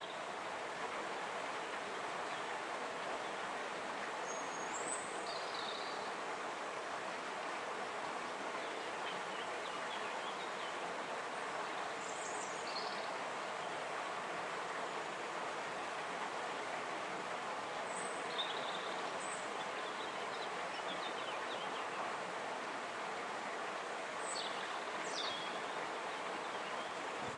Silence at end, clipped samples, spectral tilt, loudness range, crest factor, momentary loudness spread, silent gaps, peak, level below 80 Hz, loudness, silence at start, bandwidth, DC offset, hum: 0 s; under 0.1%; -2 dB/octave; 1 LU; 16 dB; 2 LU; none; -26 dBFS; -86 dBFS; -42 LUFS; 0 s; 11.5 kHz; under 0.1%; none